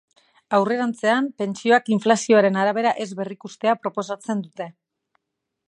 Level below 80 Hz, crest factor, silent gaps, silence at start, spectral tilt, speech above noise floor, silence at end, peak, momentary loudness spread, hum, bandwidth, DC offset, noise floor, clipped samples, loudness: -76 dBFS; 20 dB; none; 0.5 s; -5 dB/octave; 60 dB; 0.95 s; -2 dBFS; 14 LU; none; 11 kHz; under 0.1%; -81 dBFS; under 0.1%; -21 LUFS